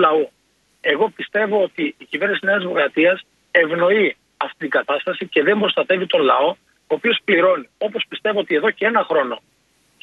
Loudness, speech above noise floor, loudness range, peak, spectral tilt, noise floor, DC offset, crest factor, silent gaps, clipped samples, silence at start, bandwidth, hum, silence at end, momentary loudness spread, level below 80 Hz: -19 LUFS; 43 dB; 1 LU; 0 dBFS; -6 dB/octave; -61 dBFS; under 0.1%; 18 dB; none; under 0.1%; 0 s; 6.4 kHz; none; 0.65 s; 10 LU; -70 dBFS